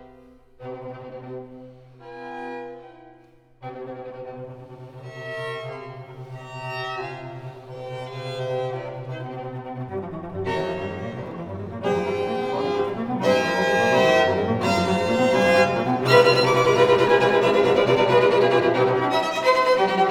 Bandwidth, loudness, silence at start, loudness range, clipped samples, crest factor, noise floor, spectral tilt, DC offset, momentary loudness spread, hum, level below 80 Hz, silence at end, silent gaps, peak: 16 kHz; -21 LUFS; 0 s; 20 LU; under 0.1%; 20 dB; -53 dBFS; -5.5 dB/octave; under 0.1%; 21 LU; none; -58 dBFS; 0 s; none; -2 dBFS